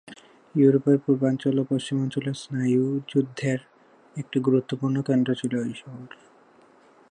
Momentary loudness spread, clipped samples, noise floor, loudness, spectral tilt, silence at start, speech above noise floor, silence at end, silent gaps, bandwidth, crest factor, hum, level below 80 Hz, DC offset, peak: 12 LU; under 0.1%; -56 dBFS; -24 LUFS; -7.5 dB/octave; 0.05 s; 32 dB; 1.05 s; none; 10 kHz; 18 dB; none; -72 dBFS; under 0.1%; -8 dBFS